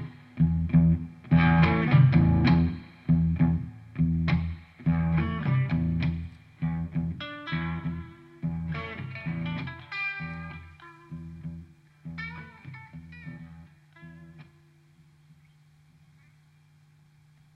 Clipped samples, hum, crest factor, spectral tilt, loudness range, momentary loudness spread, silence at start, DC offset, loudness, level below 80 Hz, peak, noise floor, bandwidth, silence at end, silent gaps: under 0.1%; none; 20 dB; -9.5 dB/octave; 21 LU; 23 LU; 0 s; under 0.1%; -26 LUFS; -42 dBFS; -8 dBFS; -59 dBFS; 5.4 kHz; 3.1 s; none